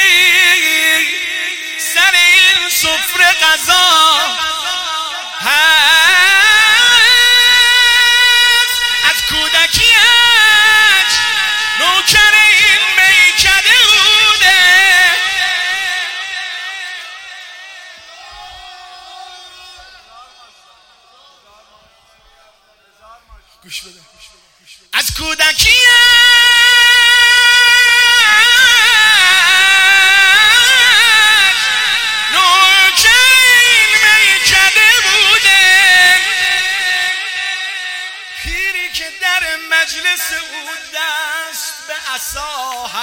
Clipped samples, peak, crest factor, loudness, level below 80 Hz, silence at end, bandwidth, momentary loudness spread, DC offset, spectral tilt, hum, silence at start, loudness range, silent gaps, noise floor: under 0.1%; 0 dBFS; 10 dB; -7 LUFS; -42 dBFS; 0 s; 17 kHz; 15 LU; under 0.1%; 1.5 dB/octave; none; 0 s; 11 LU; none; -51 dBFS